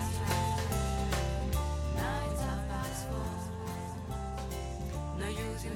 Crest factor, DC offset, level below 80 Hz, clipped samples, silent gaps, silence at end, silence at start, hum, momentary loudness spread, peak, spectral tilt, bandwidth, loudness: 16 dB; under 0.1%; -40 dBFS; under 0.1%; none; 0 s; 0 s; none; 7 LU; -18 dBFS; -5 dB/octave; 17.5 kHz; -35 LUFS